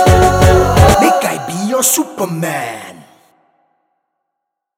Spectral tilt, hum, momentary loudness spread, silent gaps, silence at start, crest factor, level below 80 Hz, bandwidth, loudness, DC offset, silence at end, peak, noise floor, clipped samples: -4.5 dB/octave; none; 11 LU; none; 0 s; 14 dB; -24 dBFS; 19.5 kHz; -12 LUFS; under 0.1%; 1.85 s; 0 dBFS; -76 dBFS; 0.1%